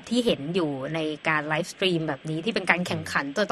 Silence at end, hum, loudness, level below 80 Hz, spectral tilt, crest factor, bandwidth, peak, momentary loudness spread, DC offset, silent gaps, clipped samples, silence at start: 0 s; none; -26 LUFS; -60 dBFS; -5 dB/octave; 24 dB; 12.5 kHz; -2 dBFS; 6 LU; under 0.1%; none; under 0.1%; 0 s